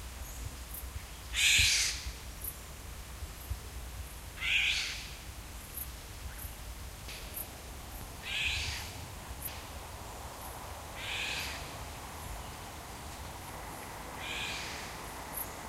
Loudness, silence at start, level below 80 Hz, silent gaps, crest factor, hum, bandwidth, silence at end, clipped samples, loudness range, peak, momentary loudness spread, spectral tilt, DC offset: -35 LUFS; 0 s; -48 dBFS; none; 24 dB; none; 16 kHz; 0 s; under 0.1%; 10 LU; -14 dBFS; 17 LU; -1 dB/octave; under 0.1%